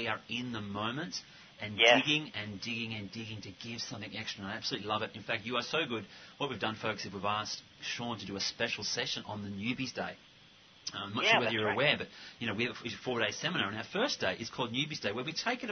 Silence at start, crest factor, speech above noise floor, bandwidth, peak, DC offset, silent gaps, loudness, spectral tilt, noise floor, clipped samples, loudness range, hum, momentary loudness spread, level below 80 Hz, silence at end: 0 s; 24 dB; 24 dB; 6.6 kHz; -10 dBFS; under 0.1%; none; -33 LUFS; -3.5 dB/octave; -59 dBFS; under 0.1%; 5 LU; none; 14 LU; -70 dBFS; 0 s